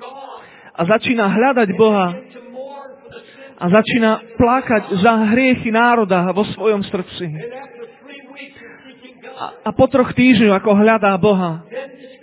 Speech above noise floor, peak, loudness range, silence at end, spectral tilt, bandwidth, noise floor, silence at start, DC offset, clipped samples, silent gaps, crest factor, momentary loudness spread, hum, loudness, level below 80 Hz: 27 dB; 0 dBFS; 7 LU; 0.15 s; -10.5 dB/octave; 4 kHz; -41 dBFS; 0 s; under 0.1%; under 0.1%; none; 16 dB; 22 LU; none; -15 LUFS; -46 dBFS